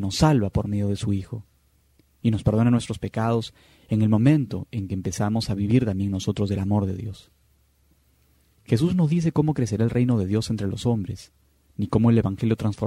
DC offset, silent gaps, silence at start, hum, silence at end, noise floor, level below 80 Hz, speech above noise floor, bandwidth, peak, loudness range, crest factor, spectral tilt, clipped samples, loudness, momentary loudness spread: under 0.1%; none; 0 s; none; 0 s; -62 dBFS; -46 dBFS; 40 dB; 13 kHz; -6 dBFS; 3 LU; 18 dB; -7 dB/octave; under 0.1%; -23 LUFS; 10 LU